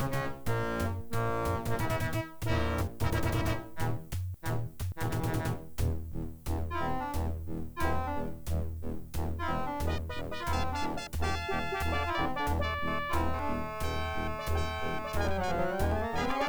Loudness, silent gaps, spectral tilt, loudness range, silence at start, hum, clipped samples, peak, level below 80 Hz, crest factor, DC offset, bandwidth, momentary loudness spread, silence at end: -34 LUFS; none; -6 dB/octave; 3 LU; 0 s; none; under 0.1%; -16 dBFS; -40 dBFS; 16 dB; under 0.1%; over 20 kHz; 6 LU; 0 s